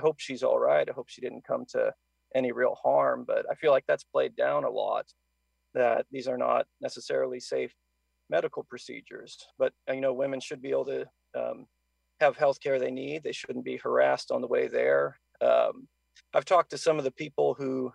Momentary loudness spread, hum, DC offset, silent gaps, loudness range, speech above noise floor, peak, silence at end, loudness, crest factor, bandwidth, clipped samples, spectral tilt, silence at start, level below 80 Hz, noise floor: 13 LU; none; under 0.1%; none; 6 LU; 38 dB; -10 dBFS; 0.05 s; -29 LUFS; 18 dB; 11 kHz; under 0.1%; -4.5 dB/octave; 0 s; -78 dBFS; -67 dBFS